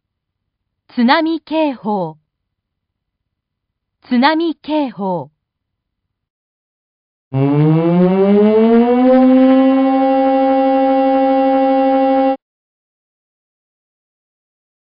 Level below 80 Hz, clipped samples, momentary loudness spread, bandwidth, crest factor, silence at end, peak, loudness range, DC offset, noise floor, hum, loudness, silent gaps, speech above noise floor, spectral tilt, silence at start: -56 dBFS; under 0.1%; 10 LU; 5.2 kHz; 14 dB; 2.45 s; 0 dBFS; 9 LU; under 0.1%; -76 dBFS; none; -13 LUFS; 6.30-7.31 s; 64 dB; -12 dB/octave; 0.95 s